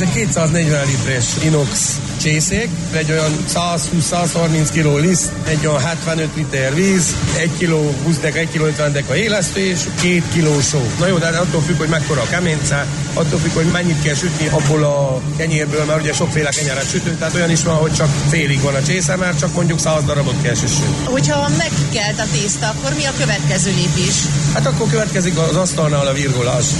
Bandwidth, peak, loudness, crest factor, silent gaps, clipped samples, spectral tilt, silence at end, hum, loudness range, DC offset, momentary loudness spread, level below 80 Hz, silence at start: 12 kHz; -4 dBFS; -16 LUFS; 12 dB; none; under 0.1%; -4.5 dB/octave; 0 s; none; 1 LU; under 0.1%; 3 LU; -36 dBFS; 0 s